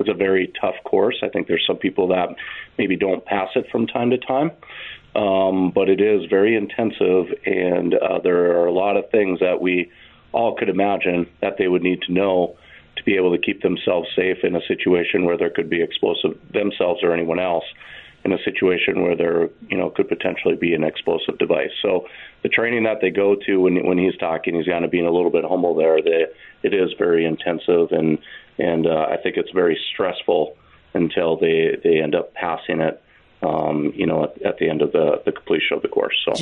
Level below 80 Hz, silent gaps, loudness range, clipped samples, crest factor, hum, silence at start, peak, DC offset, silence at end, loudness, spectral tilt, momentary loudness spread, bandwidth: -58 dBFS; none; 3 LU; under 0.1%; 14 dB; none; 0 s; -6 dBFS; under 0.1%; 0 s; -20 LUFS; -7 dB/octave; 6 LU; 7 kHz